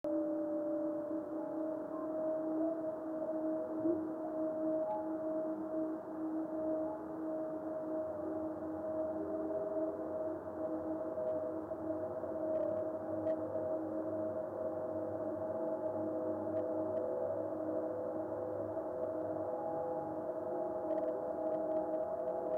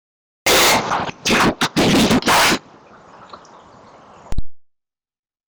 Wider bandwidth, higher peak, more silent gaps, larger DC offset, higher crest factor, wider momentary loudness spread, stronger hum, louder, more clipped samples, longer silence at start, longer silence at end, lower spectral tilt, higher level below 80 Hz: second, 3.2 kHz vs over 20 kHz; second, -24 dBFS vs -8 dBFS; neither; neither; about the same, 14 dB vs 10 dB; second, 4 LU vs 20 LU; neither; second, -39 LUFS vs -15 LUFS; neither; second, 0.05 s vs 0.45 s; second, 0 s vs 0.9 s; first, -10 dB/octave vs -3 dB/octave; second, -76 dBFS vs -38 dBFS